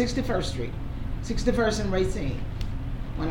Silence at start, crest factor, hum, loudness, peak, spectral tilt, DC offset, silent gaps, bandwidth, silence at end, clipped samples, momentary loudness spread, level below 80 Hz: 0 s; 16 dB; none; -29 LUFS; -10 dBFS; -6 dB/octave; under 0.1%; none; 17 kHz; 0 s; under 0.1%; 10 LU; -32 dBFS